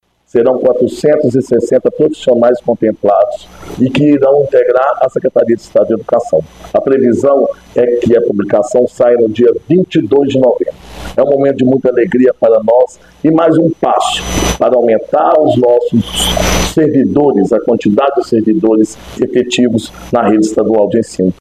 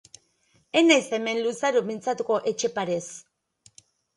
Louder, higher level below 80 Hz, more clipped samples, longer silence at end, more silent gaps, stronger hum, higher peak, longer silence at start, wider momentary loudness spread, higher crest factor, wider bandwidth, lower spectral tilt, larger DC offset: first, -11 LUFS vs -24 LUFS; first, -34 dBFS vs -74 dBFS; neither; second, 0.1 s vs 0.95 s; neither; neither; first, 0 dBFS vs -4 dBFS; second, 0.35 s vs 0.75 s; second, 6 LU vs 11 LU; second, 10 dB vs 22 dB; first, 14 kHz vs 11.5 kHz; first, -5.5 dB/octave vs -3 dB/octave; neither